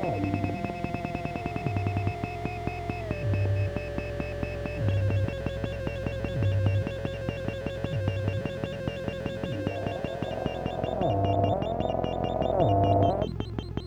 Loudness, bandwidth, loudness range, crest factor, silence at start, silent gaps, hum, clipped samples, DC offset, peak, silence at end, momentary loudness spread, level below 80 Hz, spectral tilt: -30 LUFS; 8.6 kHz; 5 LU; 20 dB; 0 s; none; none; under 0.1%; under 0.1%; -10 dBFS; 0 s; 8 LU; -42 dBFS; -8 dB/octave